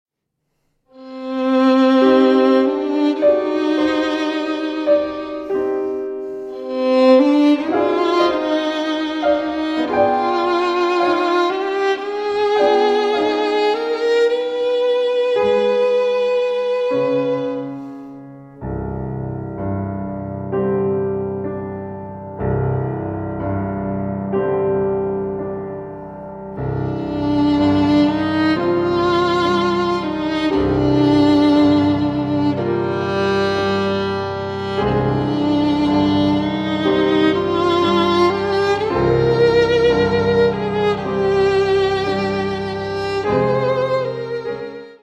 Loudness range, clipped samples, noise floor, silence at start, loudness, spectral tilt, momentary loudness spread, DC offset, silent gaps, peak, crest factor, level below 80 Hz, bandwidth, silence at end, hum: 7 LU; under 0.1%; -74 dBFS; 0.95 s; -18 LUFS; -7 dB/octave; 12 LU; under 0.1%; none; 0 dBFS; 16 dB; -44 dBFS; 8.2 kHz; 0.1 s; none